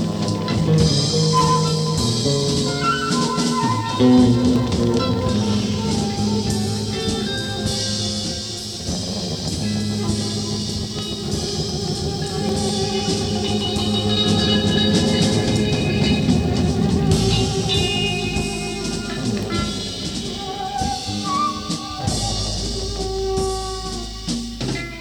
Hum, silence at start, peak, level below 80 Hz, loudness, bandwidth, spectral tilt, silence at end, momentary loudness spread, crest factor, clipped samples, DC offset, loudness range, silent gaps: none; 0 s; -4 dBFS; -34 dBFS; -20 LUFS; 19 kHz; -5 dB/octave; 0 s; 8 LU; 16 dB; under 0.1%; under 0.1%; 6 LU; none